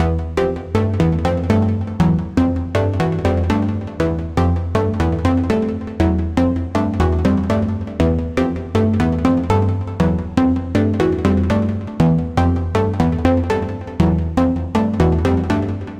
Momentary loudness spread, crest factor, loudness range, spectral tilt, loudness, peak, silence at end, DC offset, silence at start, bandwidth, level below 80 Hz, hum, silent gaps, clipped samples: 4 LU; 16 dB; 1 LU; -8.5 dB/octave; -18 LUFS; -2 dBFS; 0 s; under 0.1%; 0 s; 9.6 kHz; -28 dBFS; none; none; under 0.1%